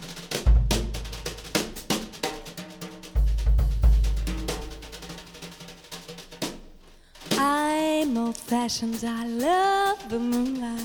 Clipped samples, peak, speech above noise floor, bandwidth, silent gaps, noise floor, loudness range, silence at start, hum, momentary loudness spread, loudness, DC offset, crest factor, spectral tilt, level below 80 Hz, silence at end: under 0.1%; -8 dBFS; 25 dB; 19 kHz; none; -50 dBFS; 6 LU; 0 s; none; 17 LU; -26 LUFS; under 0.1%; 18 dB; -5 dB/octave; -28 dBFS; 0 s